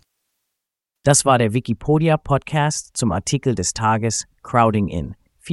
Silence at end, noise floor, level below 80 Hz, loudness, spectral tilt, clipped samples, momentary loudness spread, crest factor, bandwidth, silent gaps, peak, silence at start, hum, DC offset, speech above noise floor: 0 s; -82 dBFS; -42 dBFS; -19 LUFS; -5 dB/octave; under 0.1%; 7 LU; 20 dB; 12 kHz; none; 0 dBFS; 1.05 s; none; under 0.1%; 64 dB